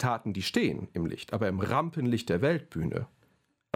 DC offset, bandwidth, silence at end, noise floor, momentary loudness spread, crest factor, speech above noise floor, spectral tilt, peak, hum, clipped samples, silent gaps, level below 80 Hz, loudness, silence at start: under 0.1%; 16 kHz; 0.7 s; -70 dBFS; 7 LU; 20 dB; 40 dB; -6.5 dB/octave; -10 dBFS; none; under 0.1%; none; -56 dBFS; -30 LUFS; 0 s